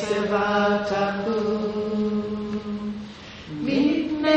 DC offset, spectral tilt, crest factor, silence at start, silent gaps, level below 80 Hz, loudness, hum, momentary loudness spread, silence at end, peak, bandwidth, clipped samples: under 0.1%; -6 dB/octave; 18 dB; 0 s; none; -52 dBFS; -24 LUFS; none; 12 LU; 0 s; -6 dBFS; 8.4 kHz; under 0.1%